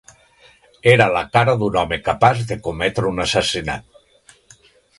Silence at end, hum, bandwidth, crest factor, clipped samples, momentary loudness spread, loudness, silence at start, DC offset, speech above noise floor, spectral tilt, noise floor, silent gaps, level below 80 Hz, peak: 1.2 s; none; 11.5 kHz; 20 dB; under 0.1%; 10 LU; -18 LUFS; 0.85 s; under 0.1%; 35 dB; -5 dB/octave; -52 dBFS; none; -44 dBFS; 0 dBFS